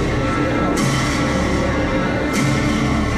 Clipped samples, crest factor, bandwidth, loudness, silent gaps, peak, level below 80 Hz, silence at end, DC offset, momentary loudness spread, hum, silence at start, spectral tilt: under 0.1%; 12 dB; 14 kHz; -18 LUFS; none; -6 dBFS; -28 dBFS; 0 s; under 0.1%; 1 LU; none; 0 s; -5.5 dB/octave